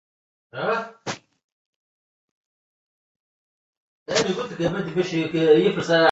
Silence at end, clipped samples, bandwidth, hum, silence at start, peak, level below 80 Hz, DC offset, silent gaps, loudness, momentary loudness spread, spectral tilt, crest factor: 0 s; under 0.1%; 8 kHz; none; 0.55 s; -4 dBFS; -62 dBFS; under 0.1%; 1.44-4.06 s; -22 LUFS; 16 LU; -5 dB/octave; 20 dB